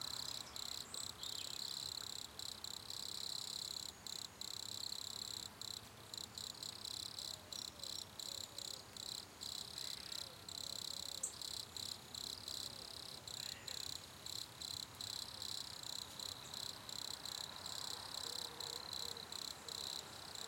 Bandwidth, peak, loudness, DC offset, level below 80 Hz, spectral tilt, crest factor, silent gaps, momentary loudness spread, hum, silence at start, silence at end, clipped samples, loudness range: 17 kHz; -28 dBFS; -46 LUFS; under 0.1%; -74 dBFS; -0.5 dB/octave; 20 dB; none; 4 LU; none; 0 s; 0 s; under 0.1%; 2 LU